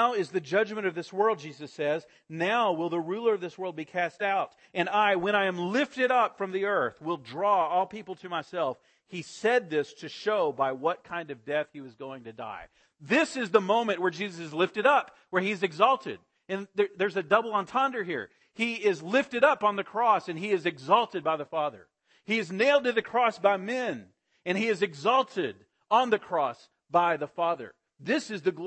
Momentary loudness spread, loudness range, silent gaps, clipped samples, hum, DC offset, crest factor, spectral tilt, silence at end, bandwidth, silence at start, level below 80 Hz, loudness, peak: 12 LU; 4 LU; none; under 0.1%; none; under 0.1%; 20 dB; -5 dB/octave; 0 s; 8.8 kHz; 0 s; -76 dBFS; -28 LUFS; -8 dBFS